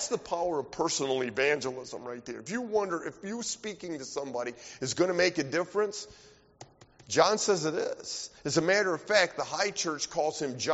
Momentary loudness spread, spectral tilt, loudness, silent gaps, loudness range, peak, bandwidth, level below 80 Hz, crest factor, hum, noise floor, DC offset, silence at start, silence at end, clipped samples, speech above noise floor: 12 LU; -2.5 dB/octave; -30 LUFS; none; 5 LU; -8 dBFS; 8 kHz; -66 dBFS; 24 dB; none; -55 dBFS; under 0.1%; 0 s; 0 s; under 0.1%; 24 dB